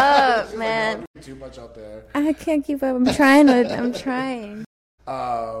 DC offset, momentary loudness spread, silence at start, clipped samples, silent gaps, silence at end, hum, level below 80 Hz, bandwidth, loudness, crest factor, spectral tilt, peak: under 0.1%; 25 LU; 0 s; under 0.1%; 1.07-1.14 s, 4.66-4.98 s; 0 s; none; -50 dBFS; 14.5 kHz; -19 LUFS; 16 dB; -4.5 dB/octave; -4 dBFS